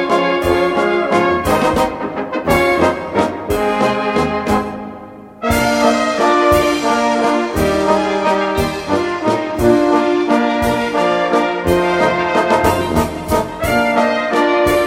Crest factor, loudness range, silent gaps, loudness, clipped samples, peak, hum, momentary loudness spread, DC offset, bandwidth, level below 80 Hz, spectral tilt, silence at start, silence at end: 14 dB; 2 LU; none; -15 LUFS; under 0.1%; 0 dBFS; none; 5 LU; under 0.1%; 16.5 kHz; -34 dBFS; -5 dB/octave; 0 s; 0 s